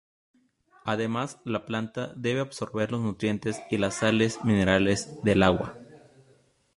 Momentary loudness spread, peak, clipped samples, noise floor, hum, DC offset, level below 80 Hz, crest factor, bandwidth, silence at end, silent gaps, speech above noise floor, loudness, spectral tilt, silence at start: 10 LU; -4 dBFS; under 0.1%; -63 dBFS; none; under 0.1%; -50 dBFS; 24 dB; 11.5 kHz; 0.8 s; none; 37 dB; -27 LUFS; -5.5 dB/octave; 0.85 s